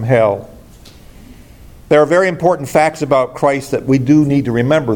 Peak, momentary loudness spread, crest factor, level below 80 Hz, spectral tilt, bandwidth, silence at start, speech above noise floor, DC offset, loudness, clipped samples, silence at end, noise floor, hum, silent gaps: 0 dBFS; 5 LU; 14 dB; -44 dBFS; -7 dB/octave; 17.5 kHz; 0 s; 26 dB; under 0.1%; -14 LUFS; under 0.1%; 0 s; -39 dBFS; none; none